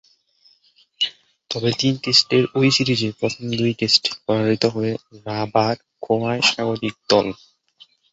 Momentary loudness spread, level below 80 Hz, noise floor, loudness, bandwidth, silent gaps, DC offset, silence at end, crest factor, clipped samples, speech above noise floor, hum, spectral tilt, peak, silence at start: 11 LU; -58 dBFS; -58 dBFS; -19 LUFS; 8.2 kHz; none; under 0.1%; 0.8 s; 20 dB; under 0.1%; 38 dB; none; -4.5 dB/octave; -2 dBFS; 1 s